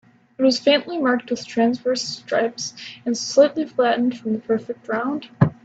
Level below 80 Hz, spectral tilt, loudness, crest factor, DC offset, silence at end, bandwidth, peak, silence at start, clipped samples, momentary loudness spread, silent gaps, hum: -62 dBFS; -5 dB/octave; -21 LUFS; 20 dB; under 0.1%; 0.1 s; 8 kHz; 0 dBFS; 0.4 s; under 0.1%; 10 LU; none; none